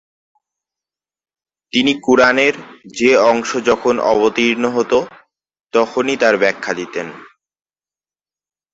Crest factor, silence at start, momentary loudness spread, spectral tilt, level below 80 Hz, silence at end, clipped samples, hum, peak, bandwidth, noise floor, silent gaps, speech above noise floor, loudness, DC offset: 18 dB; 1.75 s; 13 LU; -3.5 dB/octave; -56 dBFS; 1.5 s; under 0.1%; none; 0 dBFS; 8 kHz; under -90 dBFS; none; over 75 dB; -15 LUFS; under 0.1%